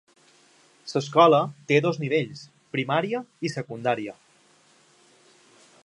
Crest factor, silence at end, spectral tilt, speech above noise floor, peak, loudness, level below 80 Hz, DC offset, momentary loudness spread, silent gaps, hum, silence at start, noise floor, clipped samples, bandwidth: 22 dB; 1.75 s; -6 dB/octave; 36 dB; -4 dBFS; -24 LUFS; -76 dBFS; under 0.1%; 16 LU; none; none; 0.85 s; -60 dBFS; under 0.1%; 11 kHz